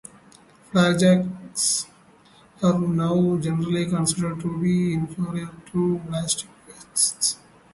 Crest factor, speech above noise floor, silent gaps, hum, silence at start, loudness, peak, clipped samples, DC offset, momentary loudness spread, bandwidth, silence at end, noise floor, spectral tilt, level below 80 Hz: 18 dB; 31 dB; none; none; 0.75 s; -23 LUFS; -6 dBFS; under 0.1%; under 0.1%; 10 LU; 12 kHz; 0.4 s; -53 dBFS; -4.5 dB/octave; -56 dBFS